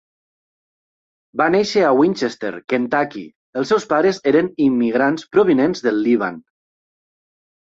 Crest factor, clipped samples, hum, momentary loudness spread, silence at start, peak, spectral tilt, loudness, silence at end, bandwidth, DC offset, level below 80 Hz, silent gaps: 16 dB; under 0.1%; none; 10 LU; 1.35 s; -2 dBFS; -6 dB/octave; -18 LUFS; 1.35 s; 7.8 kHz; under 0.1%; -62 dBFS; 3.36-3.53 s